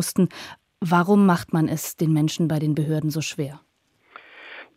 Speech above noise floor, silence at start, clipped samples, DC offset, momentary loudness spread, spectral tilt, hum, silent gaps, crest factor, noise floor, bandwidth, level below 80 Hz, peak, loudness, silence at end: 29 dB; 0 s; under 0.1%; under 0.1%; 21 LU; -6 dB/octave; none; none; 18 dB; -50 dBFS; 16 kHz; -62 dBFS; -6 dBFS; -22 LUFS; 0.15 s